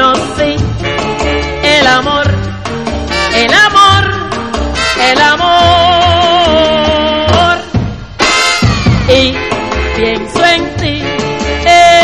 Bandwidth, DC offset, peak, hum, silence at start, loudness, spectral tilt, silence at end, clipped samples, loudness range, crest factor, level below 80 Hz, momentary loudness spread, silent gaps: 13 kHz; 1%; 0 dBFS; none; 0 s; -9 LUFS; -4 dB/octave; 0 s; 0.4%; 3 LU; 10 dB; -24 dBFS; 9 LU; none